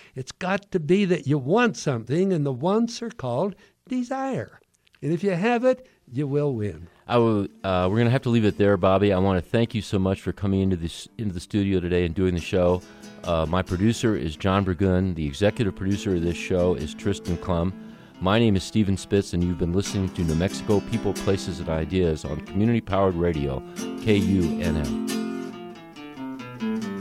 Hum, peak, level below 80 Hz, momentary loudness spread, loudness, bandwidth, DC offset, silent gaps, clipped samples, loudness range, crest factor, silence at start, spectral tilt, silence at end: none; -6 dBFS; -44 dBFS; 11 LU; -24 LUFS; 14.5 kHz; under 0.1%; none; under 0.1%; 4 LU; 18 dB; 0.15 s; -6.5 dB/octave; 0 s